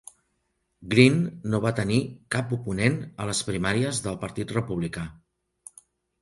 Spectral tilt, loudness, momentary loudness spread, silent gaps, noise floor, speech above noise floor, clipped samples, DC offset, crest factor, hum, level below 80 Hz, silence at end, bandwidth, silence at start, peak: -5.5 dB/octave; -25 LUFS; 13 LU; none; -75 dBFS; 50 dB; under 0.1%; under 0.1%; 24 dB; none; -52 dBFS; 1.1 s; 11.5 kHz; 0.8 s; -2 dBFS